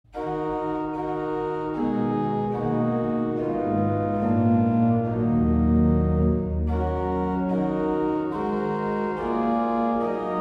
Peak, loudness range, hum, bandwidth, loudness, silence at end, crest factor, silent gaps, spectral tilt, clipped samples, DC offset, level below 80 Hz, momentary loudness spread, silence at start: -10 dBFS; 4 LU; none; 5 kHz; -24 LUFS; 0 s; 14 dB; none; -10.5 dB/octave; under 0.1%; under 0.1%; -38 dBFS; 7 LU; 0.15 s